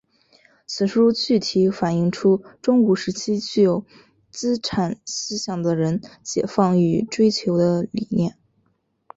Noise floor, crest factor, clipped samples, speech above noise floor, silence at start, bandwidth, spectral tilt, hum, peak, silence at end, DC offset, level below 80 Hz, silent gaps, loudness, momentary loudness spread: -68 dBFS; 16 dB; under 0.1%; 48 dB; 0.7 s; 8 kHz; -6 dB/octave; none; -4 dBFS; 0.85 s; under 0.1%; -58 dBFS; none; -21 LUFS; 9 LU